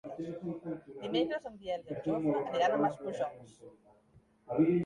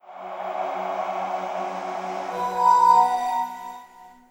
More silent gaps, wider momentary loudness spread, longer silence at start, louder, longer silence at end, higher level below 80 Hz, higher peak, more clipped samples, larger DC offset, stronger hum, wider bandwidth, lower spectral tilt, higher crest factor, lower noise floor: neither; second, 12 LU vs 18 LU; about the same, 0.05 s vs 0.05 s; second, -34 LUFS vs -23 LUFS; second, 0 s vs 0.2 s; about the same, -70 dBFS vs -70 dBFS; second, -16 dBFS vs -6 dBFS; neither; neither; neither; second, 10.5 kHz vs 16.5 kHz; first, -7 dB/octave vs -3.5 dB/octave; about the same, 18 dB vs 18 dB; first, -65 dBFS vs -47 dBFS